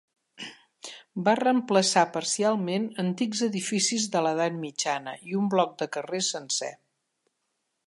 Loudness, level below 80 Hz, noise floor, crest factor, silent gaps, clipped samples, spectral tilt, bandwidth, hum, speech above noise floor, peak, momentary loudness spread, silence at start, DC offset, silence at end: -26 LUFS; -80 dBFS; -79 dBFS; 20 dB; none; under 0.1%; -3.5 dB/octave; 11.5 kHz; none; 52 dB; -8 dBFS; 17 LU; 0.4 s; under 0.1%; 1.15 s